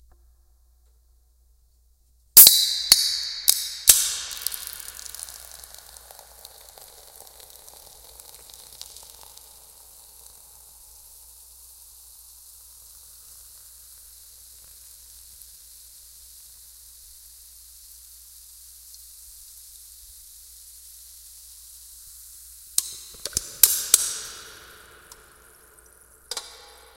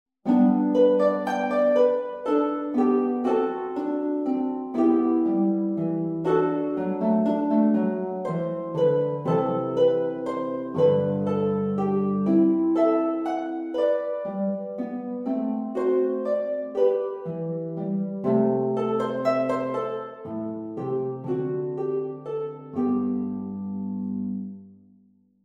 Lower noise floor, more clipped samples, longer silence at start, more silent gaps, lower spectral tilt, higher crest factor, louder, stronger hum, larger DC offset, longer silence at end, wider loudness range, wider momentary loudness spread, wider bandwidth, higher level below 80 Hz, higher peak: about the same, -60 dBFS vs -60 dBFS; neither; first, 2.35 s vs 0.25 s; neither; second, 2.5 dB/octave vs -9 dB/octave; first, 28 dB vs 14 dB; first, -17 LUFS vs -25 LUFS; neither; neither; second, 0.55 s vs 0.7 s; first, 29 LU vs 6 LU; first, 28 LU vs 10 LU; first, 17 kHz vs 8 kHz; first, -56 dBFS vs -68 dBFS; first, 0 dBFS vs -10 dBFS